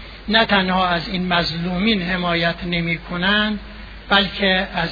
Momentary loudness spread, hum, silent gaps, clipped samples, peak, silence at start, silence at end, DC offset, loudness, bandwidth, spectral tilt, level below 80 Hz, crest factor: 7 LU; none; none; under 0.1%; -2 dBFS; 0 s; 0 s; under 0.1%; -18 LUFS; 5 kHz; -6.5 dB/octave; -38 dBFS; 18 dB